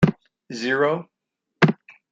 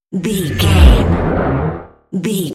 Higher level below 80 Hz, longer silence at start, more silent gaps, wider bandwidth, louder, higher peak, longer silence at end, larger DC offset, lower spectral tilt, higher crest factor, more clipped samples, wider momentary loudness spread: second, -52 dBFS vs -16 dBFS; about the same, 0 s vs 0.1 s; neither; second, 7.8 kHz vs 15.5 kHz; second, -22 LUFS vs -14 LUFS; about the same, -2 dBFS vs 0 dBFS; first, 0.4 s vs 0 s; neither; about the same, -7 dB/octave vs -6 dB/octave; first, 20 dB vs 14 dB; second, under 0.1% vs 0.4%; about the same, 14 LU vs 13 LU